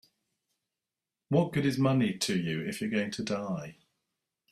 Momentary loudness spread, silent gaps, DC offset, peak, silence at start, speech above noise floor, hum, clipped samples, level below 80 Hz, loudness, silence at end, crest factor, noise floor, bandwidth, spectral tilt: 8 LU; none; under 0.1%; -12 dBFS; 1.3 s; 60 dB; none; under 0.1%; -66 dBFS; -30 LUFS; 0.8 s; 20 dB; -90 dBFS; 14.5 kHz; -5.5 dB/octave